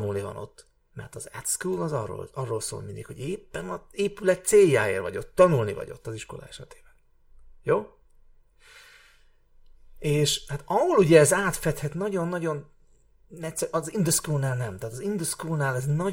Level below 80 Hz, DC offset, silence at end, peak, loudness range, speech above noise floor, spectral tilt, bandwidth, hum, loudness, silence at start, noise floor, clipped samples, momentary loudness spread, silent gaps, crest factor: -52 dBFS; under 0.1%; 0 s; -2 dBFS; 11 LU; 32 dB; -4.5 dB/octave; 17 kHz; none; -25 LUFS; 0 s; -58 dBFS; under 0.1%; 19 LU; none; 24 dB